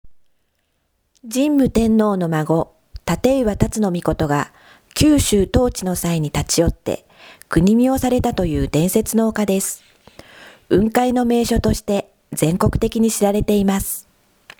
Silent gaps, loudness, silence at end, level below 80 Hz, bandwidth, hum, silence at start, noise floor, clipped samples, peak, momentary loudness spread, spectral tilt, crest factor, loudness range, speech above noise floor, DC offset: none; -18 LUFS; 0.6 s; -34 dBFS; over 20 kHz; none; 0.05 s; -67 dBFS; under 0.1%; 0 dBFS; 9 LU; -5.5 dB/octave; 18 dB; 2 LU; 50 dB; under 0.1%